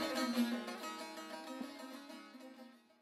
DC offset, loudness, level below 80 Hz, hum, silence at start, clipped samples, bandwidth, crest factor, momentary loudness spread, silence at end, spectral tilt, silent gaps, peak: under 0.1%; -42 LUFS; -90 dBFS; none; 0 s; under 0.1%; 16 kHz; 18 dB; 19 LU; 0.2 s; -3 dB/octave; none; -24 dBFS